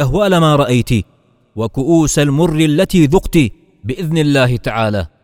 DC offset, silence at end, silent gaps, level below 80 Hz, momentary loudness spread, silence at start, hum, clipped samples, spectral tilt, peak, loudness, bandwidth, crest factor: under 0.1%; 0.15 s; none; -32 dBFS; 11 LU; 0 s; none; under 0.1%; -6 dB/octave; 0 dBFS; -13 LUFS; 16.5 kHz; 14 dB